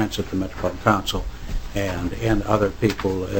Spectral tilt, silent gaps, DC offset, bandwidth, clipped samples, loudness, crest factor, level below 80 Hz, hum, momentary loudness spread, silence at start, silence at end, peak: -6 dB/octave; none; 1%; 17 kHz; under 0.1%; -23 LUFS; 22 dB; -32 dBFS; none; 10 LU; 0 s; 0 s; 0 dBFS